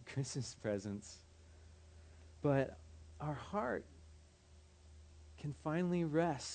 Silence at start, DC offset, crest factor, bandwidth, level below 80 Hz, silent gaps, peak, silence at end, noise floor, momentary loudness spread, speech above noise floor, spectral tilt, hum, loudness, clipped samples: 0 s; under 0.1%; 20 dB; 9 kHz; -64 dBFS; none; -22 dBFS; 0 s; -63 dBFS; 25 LU; 25 dB; -6 dB/octave; none; -40 LUFS; under 0.1%